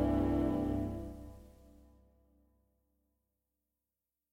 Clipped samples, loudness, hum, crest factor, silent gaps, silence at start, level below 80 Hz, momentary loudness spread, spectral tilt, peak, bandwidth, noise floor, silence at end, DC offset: under 0.1%; -35 LUFS; none; 18 dB; none; 0 s; -48 dBFS; 19 LU; -9 dB/octave; -22 dBFS; 15.5 kHz; under -90 dBFS; 2.85 s; under 0.1%